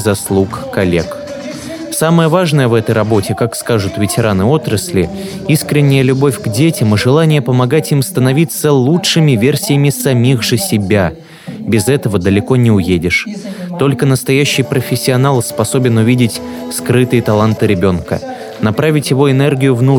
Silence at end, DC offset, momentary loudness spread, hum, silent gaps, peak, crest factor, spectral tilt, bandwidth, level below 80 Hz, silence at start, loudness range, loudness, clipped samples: 0 s; under 0.1%; 9 LU; none; none; 0 dBFS; 12 dB; -5.5 dB/octave; 19 kHz; -42 dBFS; 0 s; 2 LU; -12 LUFS; under 0.1%